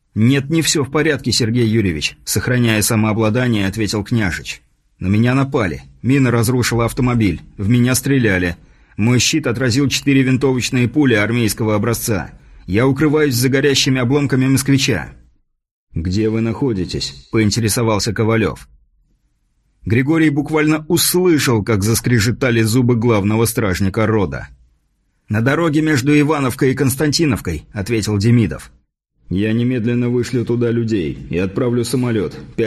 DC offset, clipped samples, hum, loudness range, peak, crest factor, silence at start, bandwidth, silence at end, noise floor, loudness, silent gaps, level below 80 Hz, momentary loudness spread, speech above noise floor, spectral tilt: under 0.1%; under 0.1%; none; 3 LU; -2 dBFS; 14 dB; 0.15 s; 13 kHz; 0 s; -63 dBFS; -16 LUFS; 15.71-15.87 s; -40 dBFS; 8 LU; 48 dB; -5 dB/octave